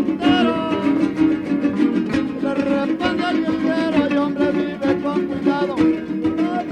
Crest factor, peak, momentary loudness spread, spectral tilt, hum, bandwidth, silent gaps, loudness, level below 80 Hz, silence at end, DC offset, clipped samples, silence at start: 14 dB; -4 dBFS; 4 LU; -6.5 dB/octave; none; 9.4 kHz; none; -19 LUFS; -50 dBFS; 0 s; under 0.1%; under 0.1%; 0 s